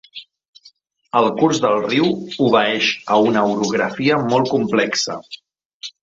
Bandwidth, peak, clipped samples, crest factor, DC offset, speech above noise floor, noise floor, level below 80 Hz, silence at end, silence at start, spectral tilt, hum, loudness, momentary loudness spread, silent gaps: 8 kHz; -2 dBFS; under 0.1%; 16 dB; under 0.1%; 35 dB; -52 dBFS; -60 dBFS; 0.15 s; 0.15 s; -4.5 dB/octave; none; -17 LUFS; 19 LU; 0.48-0.53 s, 5.65-5.80 s